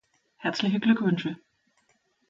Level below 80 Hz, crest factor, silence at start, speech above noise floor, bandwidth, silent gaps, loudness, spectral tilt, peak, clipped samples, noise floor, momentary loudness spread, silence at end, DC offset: -72 dBFS; 20 dB; 0.4 s; 44 dB; 7.6 kHz; none; -26 LUFS; -6.5 dB/octave; -10 dBFS; under 0.1%; -70 dBFS; 12 LU; 0.95 s; under 0.1%